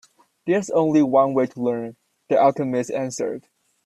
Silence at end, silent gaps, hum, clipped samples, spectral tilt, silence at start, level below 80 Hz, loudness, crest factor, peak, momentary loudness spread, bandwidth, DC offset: 0.45 s; none; none; under 0.1%; -6.5 dB/octave; 0.45 s; -66 dBFS; -21 LUFS; 18 dB; -4 dBFS; 12 LU; 12 kHz; under 0.1%